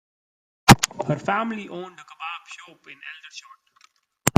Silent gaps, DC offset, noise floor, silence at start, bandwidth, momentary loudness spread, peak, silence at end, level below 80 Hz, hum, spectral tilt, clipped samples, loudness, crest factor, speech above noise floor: none; under 0.1%; -60 dBFS; 0.65 s; 16 kHz; 26 LU; 0 dBFS; 0.1 s; -44 dBFS; none; -4 dB/octave; under 0.1%; -21 LUFS; 24 dB; 30 dB